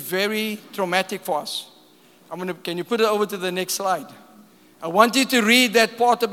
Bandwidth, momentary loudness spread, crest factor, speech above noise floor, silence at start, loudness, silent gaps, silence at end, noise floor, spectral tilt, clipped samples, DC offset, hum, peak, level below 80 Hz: 18 kHz; 14 LU; 22 dB; 32 dB; 0 s; -21 LUFS; none; 0 s; -53 dBFS; -3 dB/octave; under 0.1%; under 0.1%; none; 0 dBFS; -84 dBFS